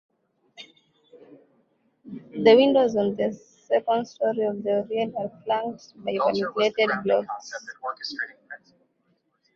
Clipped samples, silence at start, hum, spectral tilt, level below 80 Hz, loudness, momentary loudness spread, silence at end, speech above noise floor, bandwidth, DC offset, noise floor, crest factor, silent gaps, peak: under 0.1%; 0.6 s; none; -5.5 dB/octave; -70 dBFS; -24 LUFS; 24 LU; 1 s; 46 dB; 7.2 kHz; under 0.1%; -70 dBFS; 22 dB; none; -4 dBFS